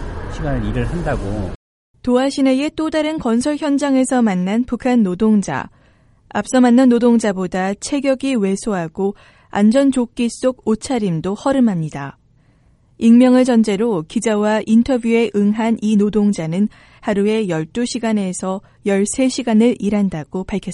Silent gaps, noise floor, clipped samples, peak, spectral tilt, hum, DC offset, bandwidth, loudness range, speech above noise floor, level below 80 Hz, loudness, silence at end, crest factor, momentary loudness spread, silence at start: 1.55-1.94 s; -53 dBFS; under 0.1%; -2 dBFS; -6 dB/octave; none; under 0.1%; 11.5 kHz; 4 LU; 37 dB; -38 dBFS; -17 LUFS; 0 s; 16 dB; 11 LU; 0 s